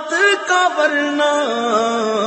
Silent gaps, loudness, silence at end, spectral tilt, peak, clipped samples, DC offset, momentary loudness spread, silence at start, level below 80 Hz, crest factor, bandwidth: none; -16 LUFS; 0 s; -2 dB/octave; -4 dBFS; under 0.1%; under 0.1%; 3 LU; 0 s; -72 dBFS; 12 dB; 8.6 kHz